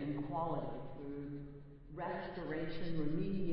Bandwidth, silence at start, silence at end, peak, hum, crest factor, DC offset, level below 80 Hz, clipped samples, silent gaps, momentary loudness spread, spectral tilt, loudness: 5.6 kHz; 0 s; 0 s; -24 dBFS; none; 14 dB; under 0.1%; -56 dBFS; under 0.1%; none; 10 LU; -6.5 dB/octave; -42 LUFS